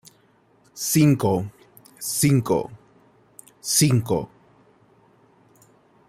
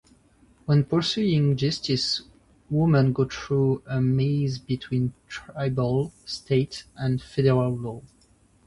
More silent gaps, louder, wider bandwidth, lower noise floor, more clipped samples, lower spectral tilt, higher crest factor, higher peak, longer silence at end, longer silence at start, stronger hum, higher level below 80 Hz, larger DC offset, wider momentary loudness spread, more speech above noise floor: neither; first, -21 LUFS vs -25 LUFS; first, 16 kHz vs 11 kHz; about the same, -59 dBFS vs -60 dBFS; neither; second, -5 dB/octave vs -7 dB/octave; about the same, 20 dB vs 16 dB; first, -4 dBFS vs -8 dBFS; first, 1.8 s vs 0.65 s; about the same, 0.75 s vs 0.7 s; neither; second, -58 dBFS vs -52 dBFS; neither; first, 17 LU vs 11 LU; about the same, 39 dB vs 36 dB